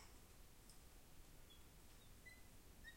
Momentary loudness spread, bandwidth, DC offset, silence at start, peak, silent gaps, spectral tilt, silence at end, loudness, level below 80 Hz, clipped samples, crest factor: 3 LU; 16.5 kHz; under 0.1%; 0 s; -48 dBFS; none; -3 dB/octave; 0 s; -65 LUFS; -66 dBFS; under 0.1%; 14 dB